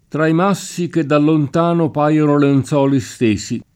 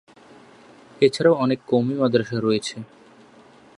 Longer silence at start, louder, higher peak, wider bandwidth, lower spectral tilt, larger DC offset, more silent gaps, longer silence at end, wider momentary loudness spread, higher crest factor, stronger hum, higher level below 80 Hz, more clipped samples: second, 0.15 s vs 1 s; first, -15 LUFS vs -21 LUFS; about the same, -2 dBFS vs -4 dBFS; first, 15 kHz vs 11 kHz; about the same, -7 dB/octave vs -6 dB/octave; neither; neither; second, 0.15 s vs 0.95 s; second, 6 LU vs 13 LU; second, 12 dB vs 20 dB; neither; first, -52 dBFS vs -64 dBFS; neither